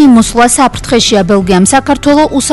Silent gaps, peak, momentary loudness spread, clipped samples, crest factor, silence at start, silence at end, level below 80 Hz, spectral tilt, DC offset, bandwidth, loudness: none; 0 dBFS; 3 LU; 1%; 6 dB; 0 s; 0 s; -28 dBFS; -4 dB/octave; under 0.1%; 12 kHz; -7 LUFS